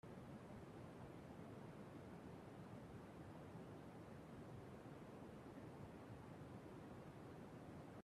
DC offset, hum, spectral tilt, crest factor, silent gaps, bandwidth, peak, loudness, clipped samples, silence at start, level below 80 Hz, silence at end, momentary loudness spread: under 0.1%; none; -7 dB/octave; 12 dB; none; 13.5 kHz; -44 dBFS; -58 LUFS; under 0.1%; 0.05 s; -74 dBFS; 0 s; 1 LU